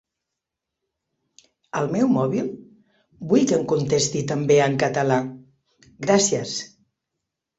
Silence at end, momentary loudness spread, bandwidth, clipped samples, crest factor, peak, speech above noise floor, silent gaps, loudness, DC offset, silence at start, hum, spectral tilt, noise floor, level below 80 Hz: 0.9 s; 13 LU; 8.4 kHz; under 0.1%; 20 dB; -4 dBFS; 63 dB; none; -21 LUFS; under 0.1%; 1.75 s; none; -4.5 dB/octave; -84 dBFS; -62 dBFS